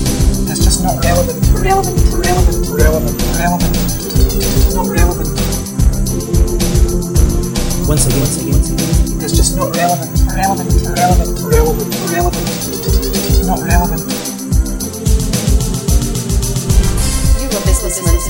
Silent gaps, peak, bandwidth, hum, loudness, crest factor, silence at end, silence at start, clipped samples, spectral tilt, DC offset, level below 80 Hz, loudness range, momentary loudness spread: none; 0 dBFS; over 20 kHz; none; -14 LUFS; 12 dB; 0 s; 0 s; under 0.1%; -5 dB/octave; under 0.1%; -16 dBFS; 2 LU; 4 LU